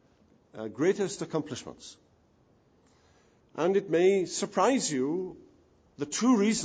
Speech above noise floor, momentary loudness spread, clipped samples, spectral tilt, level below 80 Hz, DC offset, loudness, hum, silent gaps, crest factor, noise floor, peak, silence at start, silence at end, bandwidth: 37 dB; 17 LU; under 0.1%; -4.5 dB/octave; -70 dBFS; under 0.1%; -28 LUFS; none; none; 18 dB; -65 dBFS; -12 dBFS; 0.55 s; 0 s; 10 kHz